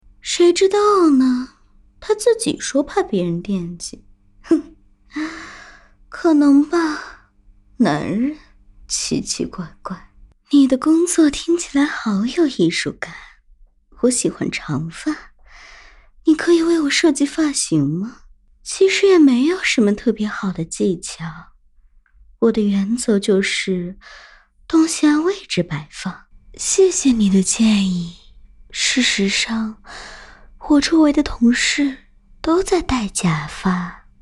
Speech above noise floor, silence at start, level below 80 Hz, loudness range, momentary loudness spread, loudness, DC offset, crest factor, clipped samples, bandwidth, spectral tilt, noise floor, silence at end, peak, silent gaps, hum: 34 dB; 0.25 s; -44 dBFS; 5 LU; 17 LU; -17 LUFS; under 0.1%; 14 dB; under 0.1%; 12.5 kHz; -4.5 dB/octave; -51 dBFS; 0.25 s; -4 dBFS; none; none